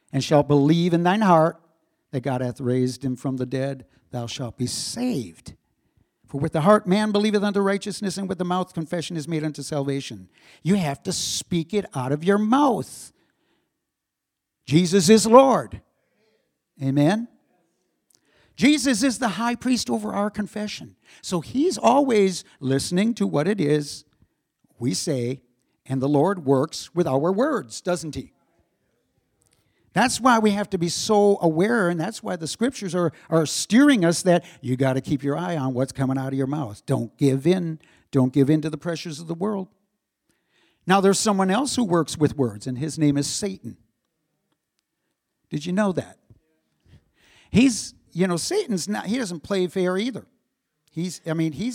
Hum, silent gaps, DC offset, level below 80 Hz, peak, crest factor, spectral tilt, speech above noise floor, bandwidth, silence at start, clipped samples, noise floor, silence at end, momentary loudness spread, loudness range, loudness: none; none; under 0.1%; -58 dBFS; 0 dBFS; 22 dB; -5.5 dB/octave; 61 dB; 16.5 kHz; 0.15 s; under 0.1%; -83 dBFS; 0 s; 13 LU; 7 LU; -22 LUFS